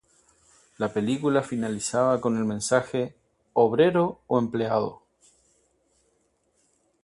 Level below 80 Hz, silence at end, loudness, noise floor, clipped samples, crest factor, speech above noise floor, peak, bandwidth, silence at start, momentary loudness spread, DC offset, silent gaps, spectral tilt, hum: -64 dBFS; 2.1 s; -25 LUFS; -70 dBFS; under 0.1%; 20 dB; 46 dB; -6 dBFS; 11.5 kHz; 0.8 s; 9 LU; under 0.1%; none; -5.5 dB/octave; none